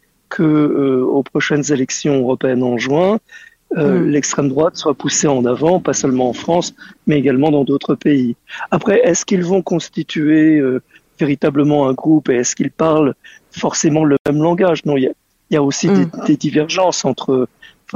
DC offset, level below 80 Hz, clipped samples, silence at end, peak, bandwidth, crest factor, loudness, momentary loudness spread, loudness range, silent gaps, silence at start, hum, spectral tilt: under 0.1%; -54 dBFS; under 0.1%; 0.5 s; -2 dBFS; 8 kHz; 12 dB; -15 LUFS; 7 LU; 1 LU; 14.20-14.25 s; 0.3 s; none; -5 dB/octave